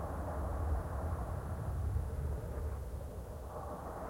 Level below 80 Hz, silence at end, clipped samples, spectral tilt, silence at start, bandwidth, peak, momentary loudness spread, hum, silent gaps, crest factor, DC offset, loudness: -42 dBFS; 0 s; under 0.1%; -8 dB/octave; 0 s; 16.5 kHz; -24 dBFS; 7 LU; none; none; 14 dB; under 0.1%; -41 LUFS